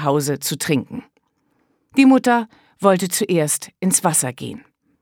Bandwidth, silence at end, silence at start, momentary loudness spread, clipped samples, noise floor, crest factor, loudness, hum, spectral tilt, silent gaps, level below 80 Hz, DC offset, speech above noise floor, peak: 18.5 kHz; 0.45 s; 0 s; 19 LU; under 0.1%; -66 dBFS; 18 dB; -18 LUFS; none; -4.5 dB/octave; none; -64 dBFS; under 0.1%; 48 dB; 0 dBFS